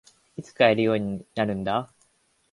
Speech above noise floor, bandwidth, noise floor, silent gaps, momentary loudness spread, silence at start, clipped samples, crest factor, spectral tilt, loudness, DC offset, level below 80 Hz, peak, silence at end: 43 dB; 11.5 kHz; -67 dBFS; none; 22 LU; 0.4 s; under 0.1%; 22 dB; -6.5 dB/octave; -24 LUFS; under 0.1%; -58 dBFS; -4 dBFS; 0.65 s